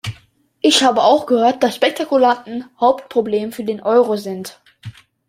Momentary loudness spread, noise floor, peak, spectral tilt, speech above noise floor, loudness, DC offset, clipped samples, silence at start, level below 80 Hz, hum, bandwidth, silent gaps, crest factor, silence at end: 14 LU; -52 dBFS; 0 dBFS; -3.5 dB/octave; 37 dB; -16 LUFS; under 0.1%; under 0.1%; 0.05 s; -60 dBFS; none; 16 kHz; none; 16 dB; 0.4 s